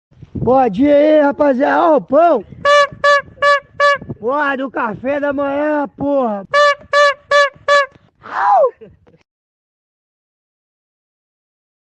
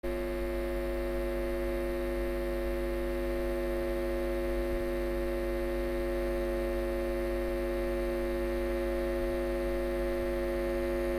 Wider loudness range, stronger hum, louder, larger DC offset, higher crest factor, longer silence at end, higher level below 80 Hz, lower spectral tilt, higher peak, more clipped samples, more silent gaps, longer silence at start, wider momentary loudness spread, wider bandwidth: first, 7 LU vs 1 LU; neither; first, -14 LUFS vs -33 LUFS; neither; about the same, 14 dB vs 12 dB; first, 3.1 s vs 0 s; second, -50 dBFS vs -38 dBFS; second, -4.5 dB/octave vs -6.5 dB/octave; first, -2 dBFS vs -20 dBFS; neither; neither; first, 0.35 s vs 0.05 s; first, 7 LU vs 1 LU; second, 9.2 kHz vs 16 kHz